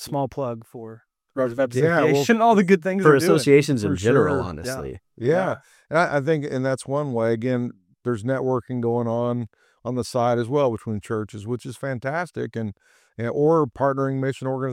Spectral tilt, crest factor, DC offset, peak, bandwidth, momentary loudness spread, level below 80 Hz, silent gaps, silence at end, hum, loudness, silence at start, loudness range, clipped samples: -6.5 dB/octave; 20 dB; under 0.1%; -2 dBFS; 15.5 kHz; 14 LU; -56 dBFS; none; 0 s; none; -22 LUFS; 0 s; 7 LU; under 0.1%